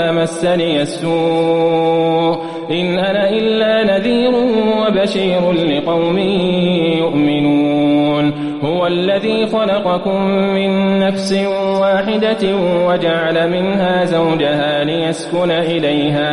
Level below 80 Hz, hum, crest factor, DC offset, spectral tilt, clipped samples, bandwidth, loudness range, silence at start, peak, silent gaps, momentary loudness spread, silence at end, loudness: -48 dBFS; none; 10 dB; under 0.1%; -6.5 dB/octave; under 0.1%; 11.5 kHz; 1 LU; 0 s; -4 dBFS; none; 3 LU; 0 s; -15 LUFS